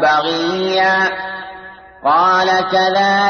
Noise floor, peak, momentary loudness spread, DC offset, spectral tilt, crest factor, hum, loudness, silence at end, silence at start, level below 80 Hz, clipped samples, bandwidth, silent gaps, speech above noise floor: -36 dBFS; -4 dBFS; 15 LU; under 0.1%; -4 dB/octave; 12 dB; none; -14 LUFS; 0 s; 0 s; -54 dBFS; under 0.1%; 6.6 kHz; none; 22 dB